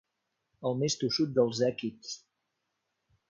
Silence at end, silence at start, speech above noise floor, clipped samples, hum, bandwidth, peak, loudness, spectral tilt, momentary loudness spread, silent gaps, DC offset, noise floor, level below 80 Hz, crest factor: 1.1 s; 0.6 s; 53 dB; under 0.1%; none; 7.8 kHz; -12 dBFS; -30 LUFS; -5 dB/octave; 15 LU; none; under 0.1%; -82 dBFS; -72 dBFS; 20 dB